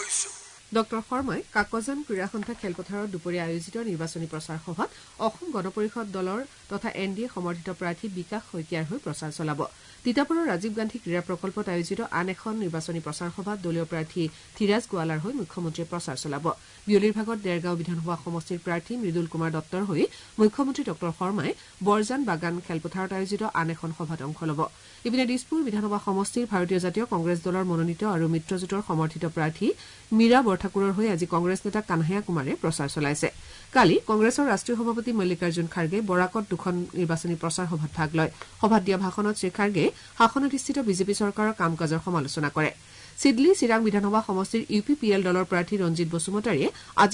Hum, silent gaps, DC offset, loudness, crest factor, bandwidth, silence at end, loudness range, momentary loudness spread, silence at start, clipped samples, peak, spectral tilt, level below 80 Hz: none; none; under 0.1%; -27 LUFS; 18 dB; 11 kHz; 0 s; 7 LU; 10 LU; 0 s; under 0.1%; -8 dBFS; -5.5 dB/octave; -58 dBFS